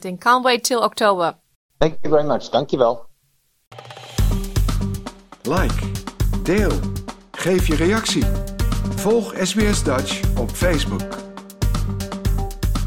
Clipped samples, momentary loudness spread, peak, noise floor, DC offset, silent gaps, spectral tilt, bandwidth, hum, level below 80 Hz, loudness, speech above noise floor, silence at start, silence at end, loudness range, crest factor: under 0.1%; 11 LU; -2 dBFS; -64 dBFS; under 0.1%; 1.55-1.69 s, 3.67-3.71 s; -5 dB/octave; 17 kHz; none; -26 dBFS; -20 LUFS; 45 dB; 0 s; 0 s; 4 LU; 18 dB